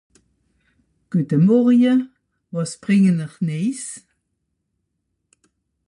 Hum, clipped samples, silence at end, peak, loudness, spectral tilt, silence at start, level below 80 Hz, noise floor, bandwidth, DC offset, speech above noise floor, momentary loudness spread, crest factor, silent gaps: none; under 0.1%; 1.9 s; -6 dBFS; -19 LUFS; -7 dB/octave; 1.1 s; -66 dBFS; -74 dBFS; 11.5 kHz; under 0.1%; 57 dB; 17 LU; 14 dB; none